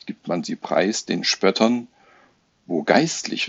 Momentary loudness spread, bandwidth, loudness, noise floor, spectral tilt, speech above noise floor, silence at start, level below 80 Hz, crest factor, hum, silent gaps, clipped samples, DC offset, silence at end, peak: 9 LU; 8.2 kHz; -21 LUFS; -59 dBFS; -3.5 dB/octave; 38 dB; 0.05 s; -68 dBFS; 22 dB; none; none; under 0.1%; under 0.1%; 0 s; -2 dBFS